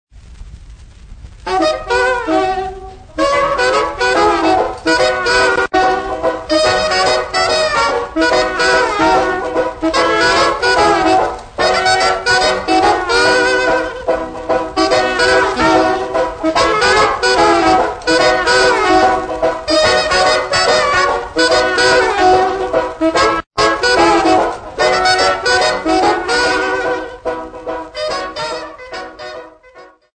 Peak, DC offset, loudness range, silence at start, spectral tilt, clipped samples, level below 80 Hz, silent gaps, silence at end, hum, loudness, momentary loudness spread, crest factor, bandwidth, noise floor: 0 dBFS; under 0.1%; 4 LU; 0.15 s; -3 dB/octave; under 0.1%; -36 dBFS; none; 0.3 s; none; -13 LUFS; 9 LU; 14 dB; 9.6 kHz; -41 dBFS